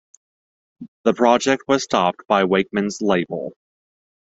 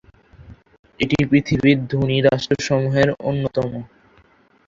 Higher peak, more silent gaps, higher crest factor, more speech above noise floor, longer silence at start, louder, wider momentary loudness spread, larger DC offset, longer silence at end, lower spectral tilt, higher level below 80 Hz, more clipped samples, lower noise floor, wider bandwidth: about the same, -2 dBFS vs -2 dBFS; first, 0.88-1.04 s vs 0.79-0.83 s; about the same, 20 dB vs 18 dB; first, over 71 dB vs 37 dB; first, 0.8 s vs 0.4 s; about the same, -19 LUFS vs -19 LUFS; about the same, 8 LU vs 8 LU; neither; about the same, 0.8 s vs 0.8 s; second, -4.5 dB/octave vs -6.5 dB/octave; second, -60 dBFS vs -46 dBFS; neither; first, under -90 dBFS vs -55 dBFS; about the same, 8.2 kHz vs 7.6 kHz